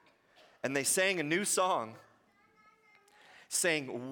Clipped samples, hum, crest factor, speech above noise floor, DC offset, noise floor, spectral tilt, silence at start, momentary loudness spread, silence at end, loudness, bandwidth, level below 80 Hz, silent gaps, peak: under 0.1%; none; 18 dB; 35 dB; under 0.1%; -67 dBFS; -2 dB/octave; 0.65 s; 7 LU; 0 s; -31 LUFS; 17 kHz; -84 dBFS; none; -16 dBFS